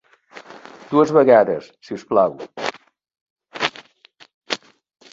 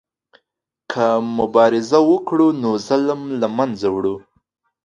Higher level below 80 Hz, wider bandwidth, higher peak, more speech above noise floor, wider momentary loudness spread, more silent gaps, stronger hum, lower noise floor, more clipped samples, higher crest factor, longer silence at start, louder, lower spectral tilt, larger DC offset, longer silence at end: second, -66 dBFS vs -58 dBFS; second, 7.8 kHz vs 8.8 kHz; about the same, -2 dBFS vs 0 dBFS; second, 35 dB vs 62 dB; first, 26 LU vs 8 LU; first, 3.21-3.36 s, 4.34-4.41 s vs none; neither; second, -52 dBFS vs -78 dBFS; neither; about the same, 20 dB vs 18 dB; second, 0.35 s vs 0.9 s; about the same, -19 LUFS vs -18 LUFS; about the same, -5 dB/octave vs -6 dB/octave; neither; about the same, 0.55 s vs 0.65 s